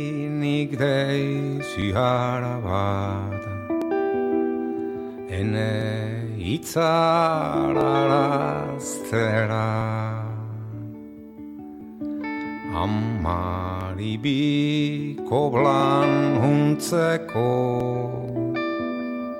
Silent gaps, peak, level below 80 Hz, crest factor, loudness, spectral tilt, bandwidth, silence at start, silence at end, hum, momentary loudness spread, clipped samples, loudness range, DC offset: none; -6 dBFS; -50 dBFS; 18 dB; -24 LUFS; -6.5 dB/octave; 16.5 kHz; 0 s; 0 s; none; 12 LU; under 0.1%; 8 LU; under 0.1%